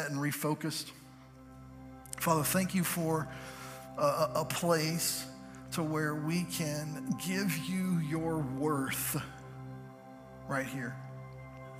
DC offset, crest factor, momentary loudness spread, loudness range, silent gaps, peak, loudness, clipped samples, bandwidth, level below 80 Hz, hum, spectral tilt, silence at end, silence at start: under 0.1%; 20 dB; 20 LU; 4 LU; none; -14 dBFS; -33 LUFS; under 0.1%; 15.5 kHz; -62 dBFS; none; -4.5 dB/octave; 0 s; 0 s